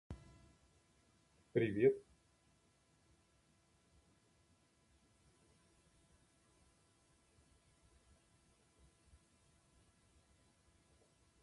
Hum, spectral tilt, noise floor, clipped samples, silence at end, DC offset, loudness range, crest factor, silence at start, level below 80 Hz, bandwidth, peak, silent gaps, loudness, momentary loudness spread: none; -7.5 dB/octave; -75 dBFS; under 0.1%; 9.4 s; under 0.1%; 2 LU; 28 dB; 0.1 s; -72 dBFS; 11.5 kHz; -20 dBFS; none; -37 LUFS; 23 LU